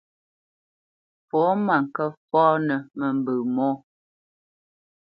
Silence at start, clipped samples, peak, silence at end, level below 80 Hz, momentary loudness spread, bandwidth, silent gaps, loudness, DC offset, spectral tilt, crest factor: 1.35 s; under 0.1%; -6 dBFS; 1.35 s; -76 dBFS; 8 LU; 5.2 kHz; 2.17-2.28 s; -23 LUFS; under 0.1%; -10 dB/octave; 20 dB